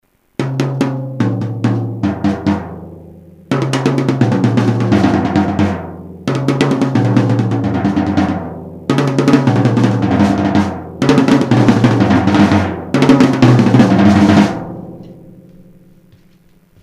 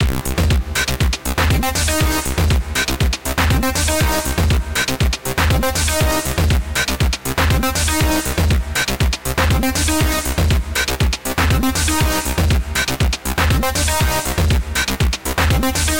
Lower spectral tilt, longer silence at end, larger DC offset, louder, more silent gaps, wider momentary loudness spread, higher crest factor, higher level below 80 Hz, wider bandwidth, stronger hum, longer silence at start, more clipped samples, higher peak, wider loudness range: first, -7.5 dB/octave vs -4 dB/octave; first, 1.55 s vs 0 s; second, under 0.1% vs 0.9%; first, -13 LUFS vs -17 LUFS; neither; first, 13 LU vs 3 LU; about the same, 14 dB vs 14 dB; second, -44 dBFS vs -22 dBFS; second, 12 kHz vs 17.5 kHz; neither; first, 0.4 s vs 0 s; first, 0.1% vs under 0.1%; first, 0 dBFS vs -4 dBFS; first, 7 LU vs 0 LU